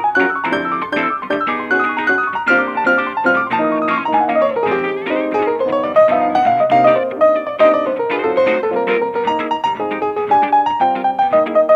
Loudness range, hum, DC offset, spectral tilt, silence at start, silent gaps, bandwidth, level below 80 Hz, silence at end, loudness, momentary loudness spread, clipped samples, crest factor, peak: 2 LU; none; under 0.1%; -6 dB/octave; 0 s; none; 7.8 kHz; -58 dBFS; 0 s; -15 LUFS; 6 LU; under 0.1%; 14 dB; 0 dBFS